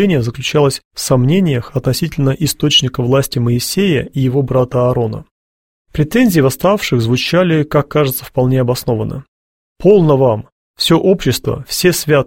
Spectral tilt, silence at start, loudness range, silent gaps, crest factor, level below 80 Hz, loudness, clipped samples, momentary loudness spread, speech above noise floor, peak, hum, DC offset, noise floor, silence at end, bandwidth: -5.5 dB/octave; 0 s; 1 LU; 0.85-0.91 s, 5.31-5.85 s, 9.28-9.76 s, 10.52-10.74 s; 14 dB; -40 dBFS; -14 LUFS; under 0.1%; 7 LU; over 77 dB; 0 dBFS; none; under 0.1%; under -90 dBFS; 0 s; 16.5 kHz